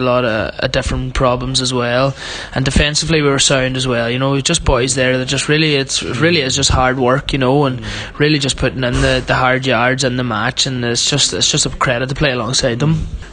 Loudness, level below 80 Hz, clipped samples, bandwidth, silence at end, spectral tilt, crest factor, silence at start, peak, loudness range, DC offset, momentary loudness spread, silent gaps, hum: -14 LUFS; -28 dBFS; under 0.1%; 10 kHz; 0 s; -3.5 dB/octave; 14 dB; 0 s; 0 dBFS; 1 LU; under 0.1%; 5 LU; none; none